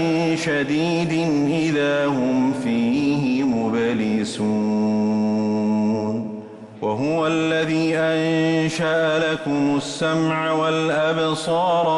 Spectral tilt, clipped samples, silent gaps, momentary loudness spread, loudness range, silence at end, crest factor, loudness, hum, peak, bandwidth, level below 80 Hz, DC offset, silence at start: -6 dB/octave; under 0.1%; none; 3 LU; 1 LU; 0 s; 10 dB; -20 LUFS; none; -10 dBFS; 11.5 kHz; -58 dBFS; under 0.1%; 0 s